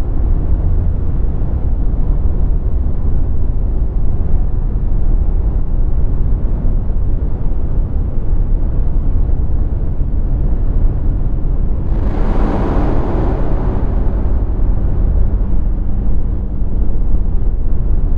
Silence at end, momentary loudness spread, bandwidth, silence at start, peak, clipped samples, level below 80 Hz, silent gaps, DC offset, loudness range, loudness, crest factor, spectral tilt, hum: 0 s; 3 LU; 2.5 kHz; 0 s; 0 dBFS; under 0.1%; -14 dBFS; none; under 0.1%; 2 LU; -19 LUFS; 12 dB; -11 dB/octave; none